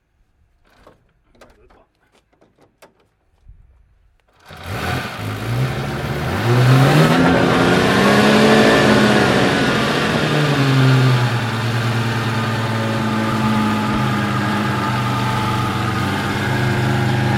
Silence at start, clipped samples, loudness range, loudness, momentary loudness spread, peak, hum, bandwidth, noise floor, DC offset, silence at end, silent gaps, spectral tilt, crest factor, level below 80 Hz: 4.5 s; under 0.1%; 13 LU; -16 LUFS; 10 LU; 0 dBFS; none; 16 kHz; -59 dBFS; under 0.1%; 0 s; none; -6 dB/octave; 16 dB; -42 dBFS